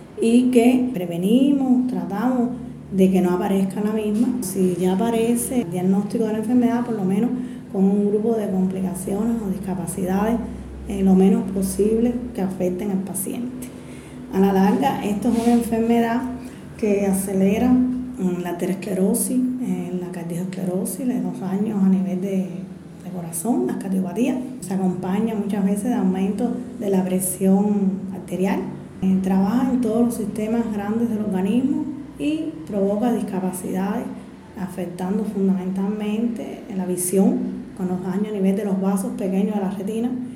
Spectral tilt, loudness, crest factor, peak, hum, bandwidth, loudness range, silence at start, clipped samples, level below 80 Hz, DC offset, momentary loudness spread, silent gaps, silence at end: -7 dB/octave; -21 LUFS; 18 dB; -2 dBFS; none; 16 kHz; 4 LU; 0 s; under 0.1%; -48 dBFS; under 0.1%; 10 LU; none; 0 s